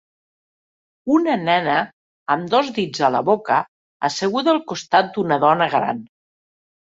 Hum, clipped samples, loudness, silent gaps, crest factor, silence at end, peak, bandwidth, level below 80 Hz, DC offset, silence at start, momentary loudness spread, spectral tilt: none; under 0.1%; -19 LUFS; 1.93-2.26 s, 3.68-4.00 s; 18 dB; 0.9 s; -2 dBFS; 8 kHz; -64 dBFS; under 0.1%; 1.05 s; 8 LU; -5 dB/octave